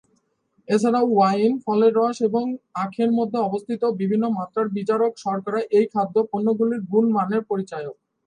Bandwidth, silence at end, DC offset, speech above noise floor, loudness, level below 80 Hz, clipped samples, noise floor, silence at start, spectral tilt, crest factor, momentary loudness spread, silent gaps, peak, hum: 10 kHz; 0.35 s; under 0.1%; 46 dB; -22 LUFS; -72 dBFS; under 0.1%; -67 dBFS; 0.7 s; -7 dB/octave; 14 dB; 9 LU; none; -6 dBFS; none